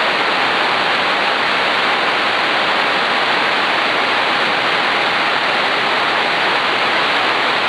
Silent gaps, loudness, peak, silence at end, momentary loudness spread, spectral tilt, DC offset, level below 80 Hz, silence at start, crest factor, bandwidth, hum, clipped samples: none; -14 LUFS; -2 dBFS; 0 s; 0 LU; -2.5 dB/octave; under 0.1%; -58 dBFS; 0 s; 14 dB; 11 kHz; none; under 0.1%